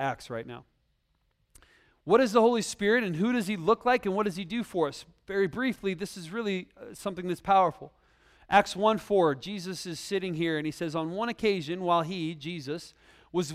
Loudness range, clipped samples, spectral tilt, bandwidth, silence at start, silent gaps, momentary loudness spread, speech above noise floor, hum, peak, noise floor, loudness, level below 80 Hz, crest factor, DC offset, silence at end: 4 LU; under 0.1%; -5 dB/octave; 15 kHz; 0 s; none; 13 LU; 45 dB; none; -6 dBFS; -73 dBFS; -28 LUFS; -62 dBFS; 22 dB; under 0.1%; 0 s